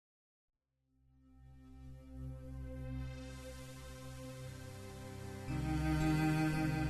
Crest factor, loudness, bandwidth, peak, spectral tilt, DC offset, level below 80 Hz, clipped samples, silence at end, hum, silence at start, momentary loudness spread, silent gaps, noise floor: 16 dB; -41 LUFS; 13.5 kHz; -24 dBFS; -6.5 dB/octave; under 0.1%; -50 dBFS; under 0.1%; 0 s; none; 1.25 s; 20 LU; none; -78 dBFS